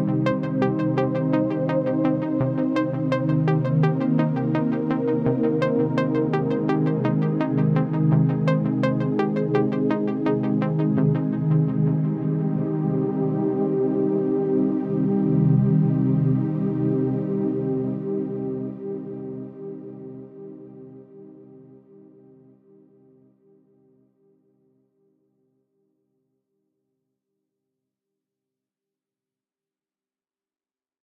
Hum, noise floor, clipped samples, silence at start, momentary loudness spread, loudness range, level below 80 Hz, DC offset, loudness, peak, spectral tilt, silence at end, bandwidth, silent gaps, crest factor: none; under -90 dBFS; under 0.1%; 0 s; 11 LU; 11 LU; -62 dBFS; under 0.1%; -22 LUFS; -8 dBFS; -10.5 dB/octave; 9.4 s; 5.6 kHz; none; 16 dB